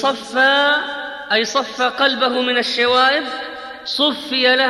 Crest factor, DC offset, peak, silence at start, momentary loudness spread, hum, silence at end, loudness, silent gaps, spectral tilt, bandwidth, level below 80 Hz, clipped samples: 14 dB; under 0.1%; -2 dBFS; 0 s; 13 LU; none; 0 s; -16 LUFS; none; -1.5 dB/octave; 13 kHz; -62 dBFS; under 0.1%